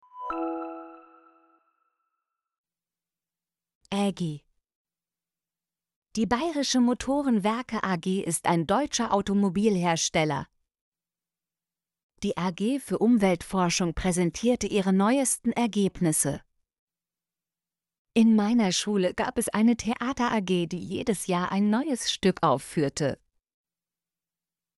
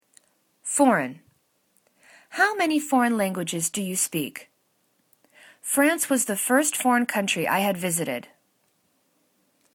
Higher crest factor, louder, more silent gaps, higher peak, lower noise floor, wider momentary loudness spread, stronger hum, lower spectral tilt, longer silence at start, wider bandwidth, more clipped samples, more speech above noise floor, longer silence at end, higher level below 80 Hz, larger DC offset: about the same, 18 dB vs 20 dB; second, -26 LUFS vs -23 LUFS; first, 2.58-2.64 s, 3.75-3.81 s, 4.75-4.85 s, 5.96-6.02 s, 10.81-10.92 s, 12.03-12.09 s, 16.79-16.87 s, 17.99-18.05 s vs none; second, -10 dBFS vs -6 dBFS; first, under -90 dBFS vs -69 dBFS; second, 9 LU vs 13 LU; neither; first, -4.5 dB/octave vs -3 dB/octave; second, 0.15 s vs 0.65 s; second, 12 kHz vs 19 kHz; neither; first, over 65 dB vs 46 dB; about the same, 1.6 s vs 1.5 s; first, -54 dBFS vs -74 dBFS; neither